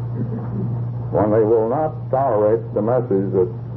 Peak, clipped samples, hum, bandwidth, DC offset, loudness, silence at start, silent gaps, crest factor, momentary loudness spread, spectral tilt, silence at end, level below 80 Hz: -6 dBFS; under 0.1%; none; 3.1 kHz; under 0.1%; -19 LUFS; 0 s; none; 14 dB; 9 LU; -13.5 dB/octave; 0 s; -46 dBFS